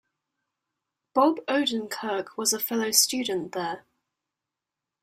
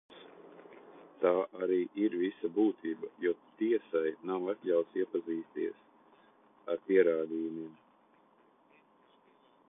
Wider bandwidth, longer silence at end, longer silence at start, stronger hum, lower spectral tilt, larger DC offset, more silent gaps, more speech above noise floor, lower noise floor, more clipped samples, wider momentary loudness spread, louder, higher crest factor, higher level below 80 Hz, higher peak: first, 16 kHz vs 3.8 kHz; second, 1.25 s vs 2 s; first, 1.15 s vs 0.1 s; neither; second, -1.5 dB/octave vs -9.5 dB/octave; neither; neither; first, 62 dB vs 34 dB; first, -88 dBFS vs -66 dBFS; neither; second, 11 LU vs 24 LU; first, -25 LUFS vs -33 LUFS; about the same, 24 dB vs 20 dB; first, -74 dBFS vs -84 dBFS; first, -6 dBFS vs -14 dBFS